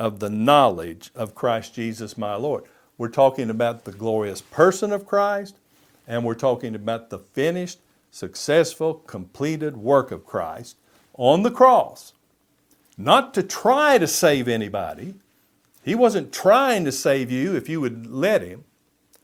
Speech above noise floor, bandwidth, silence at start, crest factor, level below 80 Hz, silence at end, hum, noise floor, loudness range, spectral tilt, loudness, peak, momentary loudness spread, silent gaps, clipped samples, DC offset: 44 dB; 16.5 kHz; 0 s; 22 dB; -64 dBFS; 0.65 s; none; -65 dBFS; 5 LU; -4.5 dB/octave; -21 LUFS; 0 dBFS; 16 LU; none; under 0.1%; under 0.1%